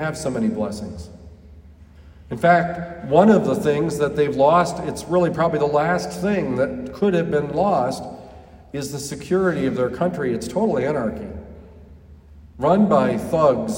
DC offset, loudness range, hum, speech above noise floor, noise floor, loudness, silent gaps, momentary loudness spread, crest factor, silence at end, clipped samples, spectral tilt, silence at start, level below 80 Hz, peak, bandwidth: under 0.1%; 5 LU; none; 25 dB; -45 dBFS; -20 LUFS; none; 15 LU; 18 dB; 0 s; under 0.1%; -6.5 dB/octave; 0 s; -48 dBFS; -2 dBFS; 16.5 kHz